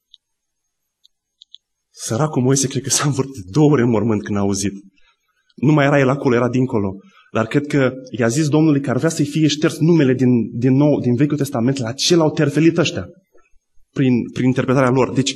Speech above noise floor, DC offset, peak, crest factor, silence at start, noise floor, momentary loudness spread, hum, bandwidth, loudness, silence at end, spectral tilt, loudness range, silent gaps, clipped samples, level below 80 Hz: 58 dB; under 0.1%; -2 dBFS; 16 dB; 1.95 s; -74 dBFS; 7 LU; none; 12.5 kHz; -17 LUFS; 0 s; -5.5 dB/octave; 3 LU; none; under 0.1%; -56 dBFS